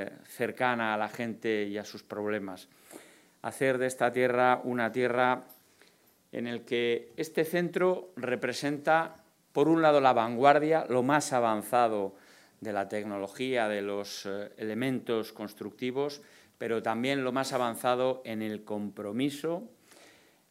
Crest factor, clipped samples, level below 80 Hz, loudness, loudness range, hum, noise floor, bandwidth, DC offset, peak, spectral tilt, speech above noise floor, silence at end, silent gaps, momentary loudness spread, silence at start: 24 dB; under 0.1%; -82 dBFS; -30 LUFS; 8 LU; none; -64 dBFS; 16 kHz; under 0.1%; -6 dBFS; -5 dB/octave; 35 dB; 0.85 s; none; 14 LU; 0 s